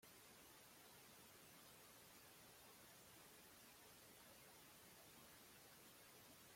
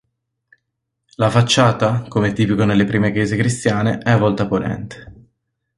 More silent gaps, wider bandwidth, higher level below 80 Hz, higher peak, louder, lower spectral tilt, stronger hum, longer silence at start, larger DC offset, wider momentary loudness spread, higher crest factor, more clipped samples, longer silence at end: neither; first, 16.5 kHz vs 11.5 kHz; second, -88 dBFS vs -46 dBFS; second, -52 dBFS vs -2 dBFS; second, -64 LUFS vs -17 LUFS; second, -2 dB/octave vs -6 dB/octave; neither; second, 0 s vs 1.2 s; neither; second, 0 LU vs 7 LU; about the same, 14 dB vs 16 dB; neither; second, 0 s vs 0.65 s